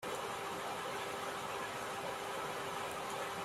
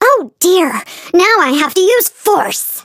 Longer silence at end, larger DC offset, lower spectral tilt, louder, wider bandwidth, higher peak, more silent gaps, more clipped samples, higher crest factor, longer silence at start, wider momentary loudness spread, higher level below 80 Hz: about the same, 0 s vs 0.05 s; neither; about the same, -2.5 dB/octave vs -1.5 dB/octave; second, -41 LUFS vs -11 LUFS; about the same, 16 kHz vs 17 kHz; second, -28 dBFS vs 0 dBFS; neither; neither; about the same, 14 dB vs 12 dB; about the same, 0 s vs 0 s; second, 0 LU vs 6 LU; second, -72 dBFS vs -60 dBFS